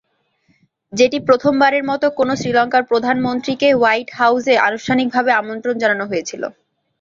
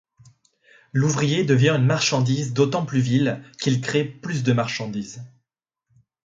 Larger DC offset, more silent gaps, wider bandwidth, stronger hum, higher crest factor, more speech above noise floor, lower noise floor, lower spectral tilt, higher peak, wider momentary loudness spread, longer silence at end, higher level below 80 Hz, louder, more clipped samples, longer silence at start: neither; neither; about the same, 7.6 kHz vs 7.8 kHz; neither; about the same, 16 dB vs 18 dB; second, 46 dB vs 60 dB; second, -62 dBFS vs -81 dBFS; about the same, -4.5 dB/octave vs -5.5 dB/octave; first, -2 dBFS vs -6 dBFS; about the same, 9 LU vs 10 LU; second, 0.5 s vs 1 s; about the same, -58 dBFS vs -60 dBFS; first, -16 LUFS vs -22 LUFS; neither; about the same, 0.9 s vs 0.95 s